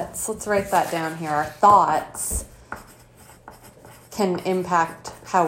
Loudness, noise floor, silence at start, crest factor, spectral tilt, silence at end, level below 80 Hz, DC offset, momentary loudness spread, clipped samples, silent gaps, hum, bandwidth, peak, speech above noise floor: -22 LUFS; -49 dBFS; 0 s; 20 dB; -4 dB/octave; 0 s; -44 dBFS; under 0.1%; 22 LU; under 0.1%; none; none; 16.5 kHz; -2 dBFS; 27 dB